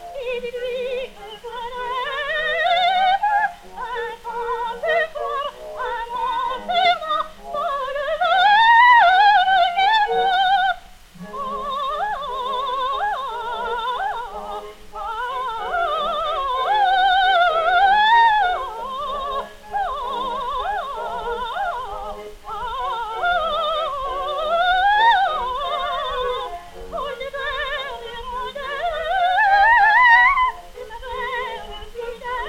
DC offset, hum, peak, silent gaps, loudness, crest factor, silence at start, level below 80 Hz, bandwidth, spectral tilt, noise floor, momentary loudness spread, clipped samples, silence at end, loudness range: under 0.1%; none; -2 dBFS; none; -19 LUFS; 18 dB; 0 s; -44 dBFS; 16 kHz; -2 dB/octave; -40 dBFS; 17 LU; under 0.1%; 0 s; 10 LU